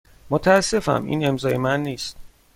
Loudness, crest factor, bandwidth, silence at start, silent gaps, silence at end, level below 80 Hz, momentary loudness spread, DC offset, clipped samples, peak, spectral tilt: -21 LUFS; 20 dB; 16.5 kHz; 0.25 s; none; 0.3 s; -46 dBFS; 11 LU; under 0.1%; under 0.1%; -2 dBFS; -5 dB/octave